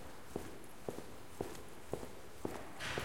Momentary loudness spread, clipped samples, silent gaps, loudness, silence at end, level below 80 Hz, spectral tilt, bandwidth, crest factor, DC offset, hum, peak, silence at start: 7 LU; under 0.1%; none; -48 LUFS; 0 s; -62 dBFS; -4 dB/octave; 16.5 kHz; 24 dB; 0.4%; none; -24 dBFS; 0 s